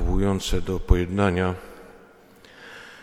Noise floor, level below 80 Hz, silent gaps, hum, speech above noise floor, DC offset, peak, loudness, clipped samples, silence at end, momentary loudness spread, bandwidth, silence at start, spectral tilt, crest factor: -51 dBFS; -28 dBFS; none; none; 29 dB; under 0.1%; -2 dBFS; -24 LUFS; under 0.1%; 0.05 s; 22 LU; 15.5 kHz; 0 s; -6 dB/octave; 22 dB